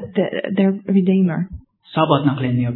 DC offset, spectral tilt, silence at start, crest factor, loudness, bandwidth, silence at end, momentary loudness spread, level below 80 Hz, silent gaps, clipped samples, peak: under 0.1%; -11.5 dB/octave; 0 s; 18 dB; -18 LUFS; 4.2 kHz; 0 s; 9 LU; -48 dBFS; none; under 0.1%; 0 dBFS